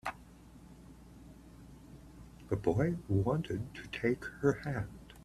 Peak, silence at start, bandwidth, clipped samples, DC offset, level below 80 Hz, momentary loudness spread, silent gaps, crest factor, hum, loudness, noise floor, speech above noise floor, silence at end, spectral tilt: -16 dBFS; 0.05 s; 14 kHz; under 0.1%; under 0.1%; -56 dBFS; 23 LU; none; 22 dB; none; -35 LUFS; -55 dBFS; 22 dB; 0 s; -7.5 dB/octave